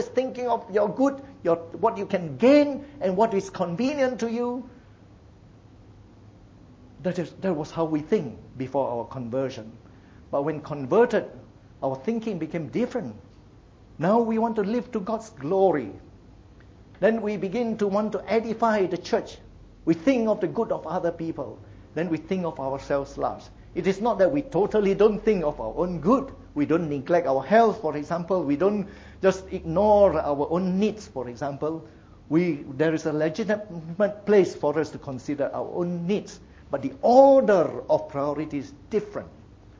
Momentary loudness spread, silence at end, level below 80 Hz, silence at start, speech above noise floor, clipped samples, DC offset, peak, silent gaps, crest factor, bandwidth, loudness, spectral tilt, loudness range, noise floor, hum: 12 LU; 0.4 s; -52 dBFS; 0 s; 27 dB; under 0.1%; under 0.1%; -4 dBFS; none; 20 dB; 7.8 kHz; -25 LUFS; -7 dB/octave; 7 LU; -51 dBFS; none